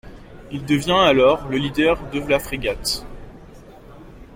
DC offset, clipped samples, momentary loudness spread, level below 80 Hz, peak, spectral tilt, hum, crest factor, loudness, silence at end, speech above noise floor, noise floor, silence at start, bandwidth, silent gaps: under 0.1%; under 0.1%; 14 LU; -40 dBFS; -4 dBFS; -4.5 dB/octave; none; 18 dB; -19 LUFS; 0 s; 23 dB; -42 dBFS; 0.05 s; 16.5 kHz; none